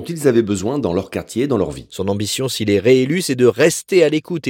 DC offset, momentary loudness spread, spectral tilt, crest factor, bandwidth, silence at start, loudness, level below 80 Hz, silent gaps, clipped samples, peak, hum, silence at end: under 0.1%; 9 LU; -5 dB/octave; 16 dB; 17 kHz; 0 s; -17 LUFS; -50 dBFS; none; under 0.1%; 0 dBFS; none; 0 s